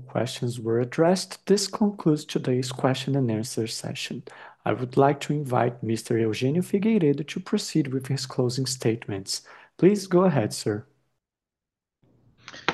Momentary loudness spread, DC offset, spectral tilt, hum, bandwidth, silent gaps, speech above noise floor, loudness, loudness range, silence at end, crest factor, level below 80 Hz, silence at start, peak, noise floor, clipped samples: 9 LU; under 0.1%; -5.5 dB/octave; none; 12.5 kHz; none; 64 dB; -25 LUFS; 2 LU; 0 s; 22 dB; -68 dBFS; 0 s; -2 dBFS; -89 dBFS; under 0.1%